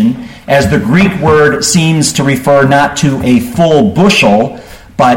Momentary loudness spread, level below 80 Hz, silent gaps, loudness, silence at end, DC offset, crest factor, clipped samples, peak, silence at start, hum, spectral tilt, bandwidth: 5 LU; -34 dBFS; none; -9 LUFS; 0 s; under 0.1%; 8 dB; under 0.1%; 0 dBFS; 0 s; none; -5 dB/octave; 17 kHz